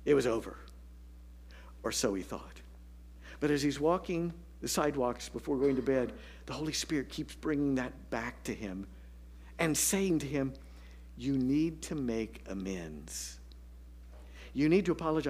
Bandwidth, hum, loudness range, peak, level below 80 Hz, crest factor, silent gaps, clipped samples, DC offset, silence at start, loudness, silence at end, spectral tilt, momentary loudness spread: 15.5 kHz; 60 Hz at -50 dBFS; 4 LU; -16 dBFS; -52 dBFS; 18 dB; none; under 0.1%; under 0.1%; 0 s; -33 LUFS; 0 s; -4.5 dB/octave; 24 LU